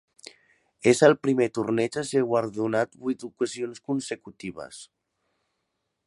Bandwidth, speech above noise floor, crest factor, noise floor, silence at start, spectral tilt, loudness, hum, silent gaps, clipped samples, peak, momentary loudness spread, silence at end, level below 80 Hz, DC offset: 11.5 kHz; 54 dB; 22 dB; -79 dBFS; 0.85 s; -5 dB/octave; -25 LUFS; none; none; under 0.1%; -4 dBFS; 19 LU; 1.2 s; -68 dBFS; under 0.1%